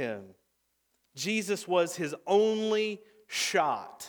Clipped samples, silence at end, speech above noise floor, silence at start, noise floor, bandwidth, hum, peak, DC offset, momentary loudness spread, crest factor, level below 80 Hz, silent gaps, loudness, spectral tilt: under 0.1%; 0 s; 47 dB; 0 s; -76 dBFS; over 20 kHz; none; -12 dBFS; under 0.1%; 10 LU; 18 dB; -84 dBFS; none; -29 LUFS; -3.5 dB/octave